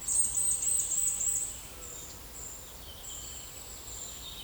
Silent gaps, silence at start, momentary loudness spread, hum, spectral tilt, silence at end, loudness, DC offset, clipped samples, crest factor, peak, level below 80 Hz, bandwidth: none; 0 s; 16 LU; none; 0 dB/octave; 0 s; -30 LUFS; under 0.1%; under 0.1%; 18 dB; -16 dBFS; -54 dBFS; over 20 kHz